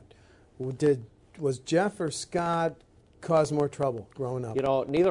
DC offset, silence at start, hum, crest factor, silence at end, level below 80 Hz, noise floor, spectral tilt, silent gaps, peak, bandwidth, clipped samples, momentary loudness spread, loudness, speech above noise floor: under 0.1%; 0.6 s; none; 18 dB; 0 s; -60 dBFS; -57 dBFS; -6 dB/octave; none; -12 dBFS; 11 kHz; under 0.1%; 9 LU; -29 LUFS; 30 dB